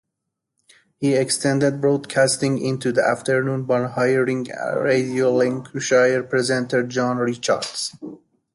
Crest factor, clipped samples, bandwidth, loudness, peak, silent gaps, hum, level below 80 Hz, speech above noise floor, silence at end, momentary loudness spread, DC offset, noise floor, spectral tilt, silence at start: 16 dB; under 0.1%; 11.5 kHz; -20 LUFS; -6 dBFS; none; none; -64 dBFS; 60 dB; 0.4 s; 7 LU; under 0.1%; -80 dBFS; -4.5 dB/octave; 1 s